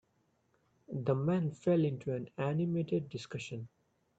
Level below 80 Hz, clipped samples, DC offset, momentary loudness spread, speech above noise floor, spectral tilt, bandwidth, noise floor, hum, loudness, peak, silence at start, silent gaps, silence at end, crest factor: -72 dBFS; under 0.1%; under 0.1%; 13 LU; 42 dB; -8 dB/octave; 8.2 kHz; -75 dBFS; none; -35 LUFS; -18 dBFS; 0.9 s; none; 0.5 s; 18 dB